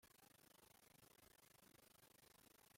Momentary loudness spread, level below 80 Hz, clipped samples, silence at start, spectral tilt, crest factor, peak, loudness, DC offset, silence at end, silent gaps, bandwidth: 0 LU; -90 dBFS; under 0.1%; 0 s; -2.5 dB/octave; 16 dB; -56 dBFS; -70 LUFS; under 0.1%; 0 s; none; 16.5 kHz